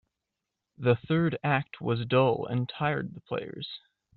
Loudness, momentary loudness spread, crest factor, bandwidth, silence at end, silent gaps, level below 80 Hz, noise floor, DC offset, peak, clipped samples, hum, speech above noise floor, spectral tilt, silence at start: -29 LUFS; 13 LU; 18 dB; 4.5 kHz; 0.4 s; none; -64 dBFS; -86 dBFS; under 0.1%; -10 dBFS; under 0.1%; none; 58 dB; -5.5 dB/octave; 0.8 s